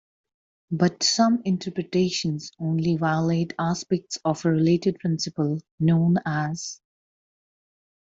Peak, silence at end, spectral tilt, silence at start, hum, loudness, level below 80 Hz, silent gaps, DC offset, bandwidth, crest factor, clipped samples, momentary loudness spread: -6 dBFS; 1.25 s; -5.5 dB/octave; 0.7 s; none; -24 LUFS; -62 dBFS; 5.71-5.78 s; under 0.1%; 7.8 kHz; 18 dB; under 0.1%; 8 LU